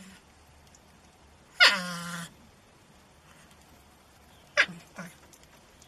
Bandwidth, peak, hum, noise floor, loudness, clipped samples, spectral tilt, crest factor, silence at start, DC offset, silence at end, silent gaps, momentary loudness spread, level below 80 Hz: 14 kHz; -4 dBFS; none; -57 dBFS; -25 LUFS; under 0.1%; -1.5 dB/octave; 28 dB; 0 s; under 0.1%; 0.8 s; none; 25 LU; -66 dBFS